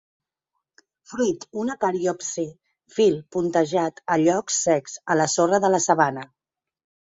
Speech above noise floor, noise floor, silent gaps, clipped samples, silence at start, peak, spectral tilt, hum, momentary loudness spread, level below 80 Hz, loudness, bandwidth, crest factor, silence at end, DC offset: 59 dB; -81 dBFS; none; under 0.1%; 1.1 s; -4 dBFS; -4 dB/octave; none; 9 LU; -66 dBFS; -22 LUFS; 8.2 kHz; 20 dB; 0.95 s; under 0.1%